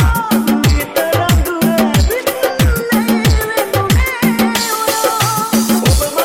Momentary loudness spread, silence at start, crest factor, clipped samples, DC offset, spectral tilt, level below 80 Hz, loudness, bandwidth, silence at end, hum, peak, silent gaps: 3 LU; 0 s; 10 dB; under 0.1%; 0.2%; -5 dB/octave; -20 dBFS; -13 LUFS; 17 kHz; 0 s; none; -4 dBFS; none